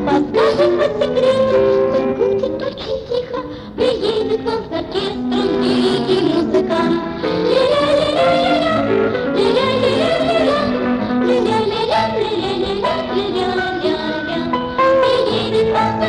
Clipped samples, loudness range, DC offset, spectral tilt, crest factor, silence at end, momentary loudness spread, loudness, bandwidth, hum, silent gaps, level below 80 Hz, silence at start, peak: under 0.1%; 3 LU; under 0.1%; -6 dB/octave; 12 dB; 0 s; 7 LU; -16 LUFS; 10.5 kHz; none; none; -42 dBFS; 0 s; -4 dBFS